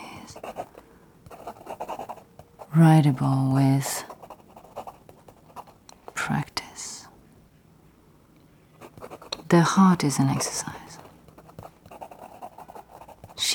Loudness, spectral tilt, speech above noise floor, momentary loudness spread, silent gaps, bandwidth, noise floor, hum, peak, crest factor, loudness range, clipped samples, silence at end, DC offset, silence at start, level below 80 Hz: -23 LUFS; -5.5 dB/octave; 36 dB; 26 LU; none; 17.5 kHz; -56 dBFS; none; -6 dBFS; 20 dB; 12 LU; under 0.1%; 0 s; under 0.1%; 0 s; -60 dBFS